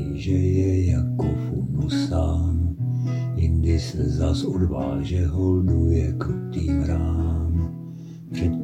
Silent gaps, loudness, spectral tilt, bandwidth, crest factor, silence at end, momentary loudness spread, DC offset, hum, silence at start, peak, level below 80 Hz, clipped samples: none; -23 LUFS; -8 dB/octave; 8.8 kHz; 14 dB; 0 s; 6 LU; under 0.1%; none; 0 s; -8 dBFS; -30 dBFS; under 0.1%